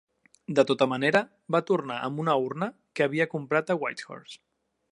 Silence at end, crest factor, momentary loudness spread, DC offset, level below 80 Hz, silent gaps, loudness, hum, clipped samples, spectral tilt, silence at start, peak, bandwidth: 0.55 s; 22 dB; 15 LU; under 0.1%; -76 dBFS; none; -27 LUFS; none; under 0.1%; -6 dB/octave; 0.5 s; -6 dBFS; 11 kHz